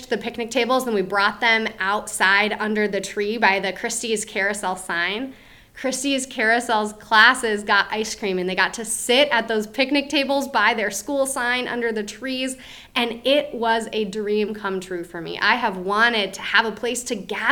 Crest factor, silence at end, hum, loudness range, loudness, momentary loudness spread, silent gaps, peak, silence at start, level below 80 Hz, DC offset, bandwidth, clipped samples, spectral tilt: 22 dB; 0 s; none; 4 LU; -21 LUFS; 9 LU; none; 0 dBFS; 0 s; -56 dBFS; under 0.1%; 19.5 kHz; under 0.1%; -2.5 dB/octave